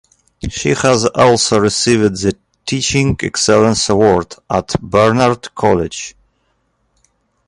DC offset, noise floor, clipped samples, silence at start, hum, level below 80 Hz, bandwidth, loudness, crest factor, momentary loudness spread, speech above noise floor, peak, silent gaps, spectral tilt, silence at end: under 0.1%; -63 dBFS; under 0.1%; 0.45 s; none; -38 dBFS; 11.5 kHz; -13 LUFS; 14 dB; 11 LU; 50 dB; 0 dBFS; none; -4.5 dB/octave; 1.35 s